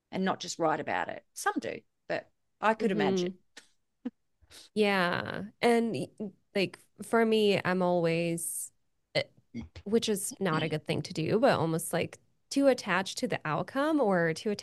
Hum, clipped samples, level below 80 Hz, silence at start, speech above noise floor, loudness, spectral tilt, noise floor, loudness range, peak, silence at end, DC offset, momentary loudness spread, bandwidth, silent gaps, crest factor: none; under 0.1%; -68 dBFS; 0.1 s; 29 dB; -30 LUFS; -4.5 dB/octave; -58 dBFS; 4 LU; -10 dBFS; 0 s; under 0.1%; 13 LU; 12.5 kHz; none; 20 dB